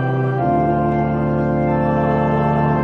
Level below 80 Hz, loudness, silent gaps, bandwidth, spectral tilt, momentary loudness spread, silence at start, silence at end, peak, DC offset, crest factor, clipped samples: -36 dBFS; -18 LUFS; none; 5.6 kHz; -10.5 dB/octave; 2 LU; 0 s; 0 s; -4 dBFS; under 0.1%; 12 dB; under 0.1%